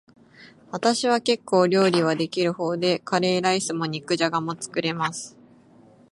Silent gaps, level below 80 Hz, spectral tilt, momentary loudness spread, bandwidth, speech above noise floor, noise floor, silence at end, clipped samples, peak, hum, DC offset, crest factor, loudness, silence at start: none; -70 dBFS; -4.5 dB/octave; 9 LU; 11.5 kHz; 30 dB; -53 dBFS; 0.85 s; under 0.1%; -6 dBFS; none; under 0.1%; 18 dB; -23 LUFS; 0.4 s